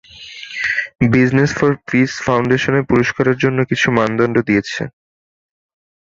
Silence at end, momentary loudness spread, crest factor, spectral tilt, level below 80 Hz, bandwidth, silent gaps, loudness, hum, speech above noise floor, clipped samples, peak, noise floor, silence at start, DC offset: 1.15 s; 11 LU; 16 dB; -6 dB/octave; -46 dBFS; 7.6 kHz; none; -16 LUFS; none; 20 dB; under 0.1%; 0 dBFS; -35 dBFS; 0.15 s; under 0.1%